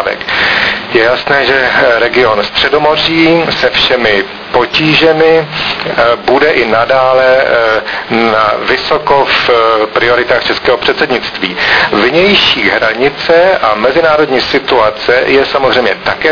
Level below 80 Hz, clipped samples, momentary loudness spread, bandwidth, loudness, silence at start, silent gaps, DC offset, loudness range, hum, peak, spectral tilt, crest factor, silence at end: -38 dBFS; 0.9%; 4 LU; 5.4 kHz; -8 LUFS; 0 s; none; 0.4%; 1 LU; none; 0 dBFS; -5 dB/octave; 10 dB; 0 s